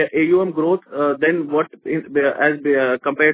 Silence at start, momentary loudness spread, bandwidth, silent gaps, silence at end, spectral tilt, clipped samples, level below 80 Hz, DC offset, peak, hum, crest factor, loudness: 0 s; 5 LU; 4 kHz; none; 0 s; -9.5 dB/octave; under 0.1%; -64 dBFS; under 0.1%; -2 dBFS; none; 16 dB; -18 LUFS